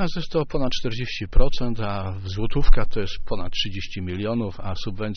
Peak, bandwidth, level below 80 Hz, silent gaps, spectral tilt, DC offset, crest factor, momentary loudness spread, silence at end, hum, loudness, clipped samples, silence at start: -2 dBFS; 6.4 kHz; -24 dBFS; none; -4.5 dB/octave; under 0.1%; 18 dB; 6 LU; 0 s; none; -27 LUFS; under 0.1%; 0 s